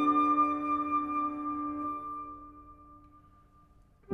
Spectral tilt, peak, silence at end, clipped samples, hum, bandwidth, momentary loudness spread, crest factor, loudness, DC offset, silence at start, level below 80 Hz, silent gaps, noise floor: -7 dB/octave; -16 dBFS; 0 s; under 0.1%; none; 6.4 kHz; 21 LU; 16 dB; -31 LUFS; under 0.1%; 0 s; -62 dBFS; none; -61 dBFS